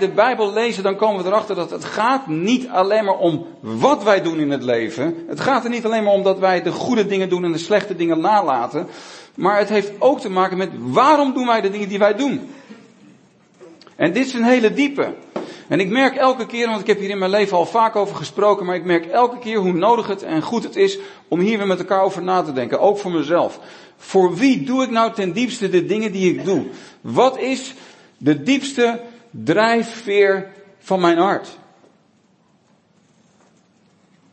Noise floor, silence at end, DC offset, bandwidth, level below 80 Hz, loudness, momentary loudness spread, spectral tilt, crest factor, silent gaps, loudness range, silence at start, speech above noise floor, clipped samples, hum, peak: -57 dBFS; 2.75 s; under 0.1%; 8.8 kHz; -70 dBFS; -18 LUFS; 8 LU; -5.5 dB/octave; 18 dB; none; 3 LU; 0 s; 40 dB; under 0.1%; none; 0 dBFS